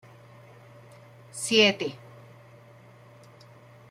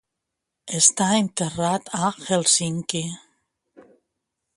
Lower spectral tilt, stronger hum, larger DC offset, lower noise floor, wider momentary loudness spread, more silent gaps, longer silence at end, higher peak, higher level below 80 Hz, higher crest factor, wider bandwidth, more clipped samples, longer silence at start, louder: about the same, -3 dB/octave vs -3 dB/octave; neither; neither; second, -52 dBFS vs -82 dBFS; first, 23 LU vs 12 LU; neither; first, 1.95 s vs 1.4 s; second, -6 dBFS vs -2 dBFS; second, -74 dBFS vs -62 dBFS; about the same, 24 dB vs 22 dB; first, 15 kHz vs 11.5 kHz; neither; first, 1.35 s vs 0.65 s; about the same, -23 LUFS vs -21 LUFS